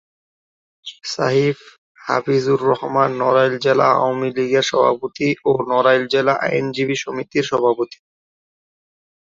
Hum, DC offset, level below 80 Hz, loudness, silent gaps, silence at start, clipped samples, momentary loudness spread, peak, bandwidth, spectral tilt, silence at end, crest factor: none; under 0.1%; -62 dBFS; -18 LUFS; 1.78-1.95 s; 0.85 s; under 0.1%; 9 LU; 0 dBFS; 7.8 kHz; -5 dB/octave; 1.5 s; 18 dB